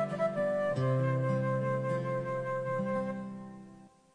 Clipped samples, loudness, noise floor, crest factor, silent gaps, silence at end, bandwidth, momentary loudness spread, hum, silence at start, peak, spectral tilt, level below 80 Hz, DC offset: under 0.1%; -32 LUFS; -55 dBFS; 12 dB; none; 0.25 s; 9.8 kHz; 12 LU; none; 0 s; -20 dBFS; -8.5 dB/octave; -70 dBFS; under 0.1%